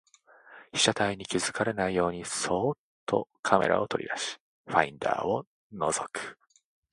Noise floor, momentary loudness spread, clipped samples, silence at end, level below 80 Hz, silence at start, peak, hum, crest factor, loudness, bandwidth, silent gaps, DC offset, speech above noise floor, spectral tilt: -56 dBFS; 11 LU; under 0.1%; 0.6 s; -60 dBFS; 0.5 s; -4 dBFS; none; 26 dB; -29 LUFS; 11.5 kHz; 2.79-3.07 s, 3.39-3.43 s, 4.40-4.64 s, 5.47-5.70 s; under 0.1%; 27 dB; -3 dB/octave